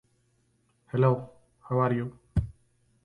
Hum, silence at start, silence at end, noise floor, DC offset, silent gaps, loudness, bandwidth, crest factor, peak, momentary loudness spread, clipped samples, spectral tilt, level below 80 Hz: none; 0.95 s; 0.55 s; -70 dBFS; under 0.1%; none; -29 LUFS; 4.5 kHz; 20 dB; -10 dBFS; 12 LU; under 0.1%; -10 dB/octave; -46 dBFS